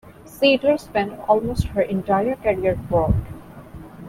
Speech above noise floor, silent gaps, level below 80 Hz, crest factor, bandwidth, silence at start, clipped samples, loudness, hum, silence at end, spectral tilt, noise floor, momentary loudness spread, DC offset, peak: 19 dB; none; -36 dBFS; 18 dB; 16 kHz; 0.05 s; under 0.1%; -21 LUFS; none; 0 s; -6.5 dB/octave; -39 dBFS; 21 LU; under 0.1%; -4 dBFS